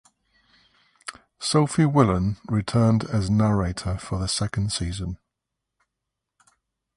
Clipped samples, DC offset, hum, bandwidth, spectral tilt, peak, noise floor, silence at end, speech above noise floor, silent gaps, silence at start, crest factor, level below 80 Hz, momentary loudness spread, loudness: under 0.1%; under 0.1%; none; 11.5 kHz; -6 dB/octave; -4 dBFS; -83 dBFS; 1.8 s; 61 dB; none; 1.05 s; 20 dB; -42 dBFS; 18 LU; -23 LUFS